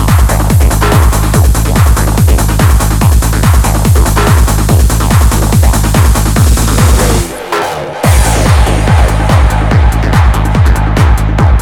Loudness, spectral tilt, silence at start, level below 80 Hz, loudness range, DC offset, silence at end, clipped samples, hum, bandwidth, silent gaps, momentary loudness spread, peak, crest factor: -9 LUFS; -5.5 dB/octave; 0 s; -10 dBFS; 1 LU; under 0.1%; 0 s; 0.7%; none; 17.5 kHz; none; 1 LU; 0 dBFS; 6 dB